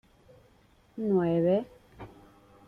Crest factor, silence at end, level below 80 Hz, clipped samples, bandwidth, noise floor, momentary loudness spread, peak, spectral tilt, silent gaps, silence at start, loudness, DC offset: 16 dB; 0.6 s; -62 dBFS; under 0.1%; 5.6 kHz; -62 dBFS; 24 LU; -16 dBFS; -10 dB/octave; none; 0.95 s; -28 LUFS; under 0.1%